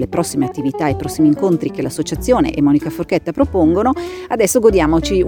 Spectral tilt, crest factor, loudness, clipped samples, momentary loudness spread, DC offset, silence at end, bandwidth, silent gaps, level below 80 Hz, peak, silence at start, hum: -6 dB/octave; 14 dB; -16 LUFS; under 0.1%; 9 LU; under 0.1%; 0 s; over 20 kHz; none; -32 dBFS; 0 dBFS; 0 s; none